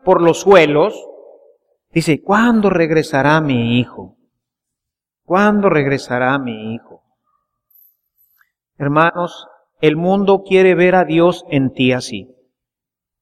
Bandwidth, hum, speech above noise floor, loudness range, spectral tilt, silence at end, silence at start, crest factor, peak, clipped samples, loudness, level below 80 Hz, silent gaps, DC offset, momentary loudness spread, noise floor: 14 kHz; none; 72 dB; 7 LU; -6.5 dB/octave; 1 s; 0.05 s; 16 dB; 0 dBFS; under 0.1%; -14 LUFS; -50 dBFS; none; under 0.1%; 14 LU; -85 dBFS